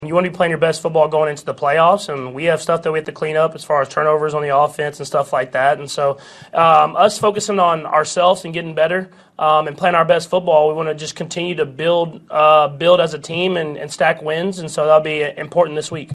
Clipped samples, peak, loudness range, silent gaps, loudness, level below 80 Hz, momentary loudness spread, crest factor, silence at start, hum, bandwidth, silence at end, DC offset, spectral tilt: under 0.1%; 0 dBFS; 2 LU; none; -16 LUFS; -60 dBFS; 9 LU; 16 dB; 0 s; none; 13 kHz; 0 s; under 0.1%; -4.5 dB/octave